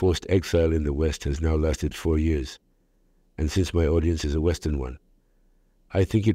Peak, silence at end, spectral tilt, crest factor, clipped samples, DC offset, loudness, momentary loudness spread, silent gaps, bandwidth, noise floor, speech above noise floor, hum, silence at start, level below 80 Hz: -8 dBFS; 0 s; -6.5 dB/octave; 16 dB; under 0.1%; under 0.1%; -25 LUFS; 9 LU; none; 14 kHz; -64 dBFS; 40 dB; none; 0 s; -32 dBFS